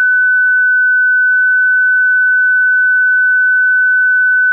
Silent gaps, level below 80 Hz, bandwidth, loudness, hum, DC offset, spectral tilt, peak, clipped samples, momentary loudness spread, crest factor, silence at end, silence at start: none; under -90 dBFS; 1.7 kHz; -9 LUFS; none; under 0.1%; 8.5 dB/octave; -8 dBFS; under 0.1%; 0 LU; 4 dB; 0 s; 0 s